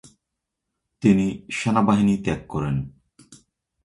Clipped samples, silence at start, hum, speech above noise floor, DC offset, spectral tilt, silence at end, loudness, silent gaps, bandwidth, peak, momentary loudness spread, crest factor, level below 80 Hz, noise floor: under 0.1%; 1 s; none; 61 dB; under 0.1%; -7 dB/octave; 0.5 s; -22 LUFS; none; 11 kHz; -6 dBFS; 8 LU; 18 dB; -48 dBFS; -82 dBFS